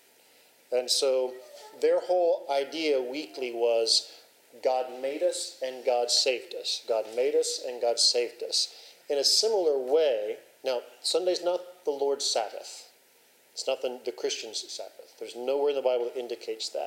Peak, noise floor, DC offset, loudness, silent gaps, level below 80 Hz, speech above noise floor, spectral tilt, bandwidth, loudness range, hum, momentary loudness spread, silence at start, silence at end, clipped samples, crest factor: -12 dBFS; -61 dBFS; under 0.1%; -28 LUFS; none; under -90 dBFS; 33 dB; 0 dB/octave; 16 kHz; 6 LU; none; 13 LU; 0.7 s; 0 s; under 0.1%; 18 dB